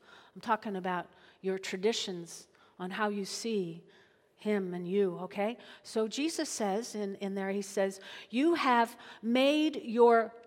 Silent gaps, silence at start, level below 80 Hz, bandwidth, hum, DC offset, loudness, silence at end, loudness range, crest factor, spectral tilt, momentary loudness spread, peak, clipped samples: none; 0.15 s; -84 dBFS; 16 kHz; none; under 0.1%; -32 LUFS; 0.05 s; 6 LU; 20 dB; -4.5 dB/octave; 14 LU; -12 dBFS; under 0.1%